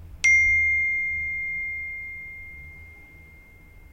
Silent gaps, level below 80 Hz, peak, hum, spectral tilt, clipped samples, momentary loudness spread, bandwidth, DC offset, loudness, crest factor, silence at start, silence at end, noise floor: none; -48 dBFS; -8 dBFS; none; -1 dB/octave; under 0.1%; 23 LU; 16 kHz; under 0.1%; -21 LUFS; 18 dB; 0 s; 0.15 s; -49 dBFS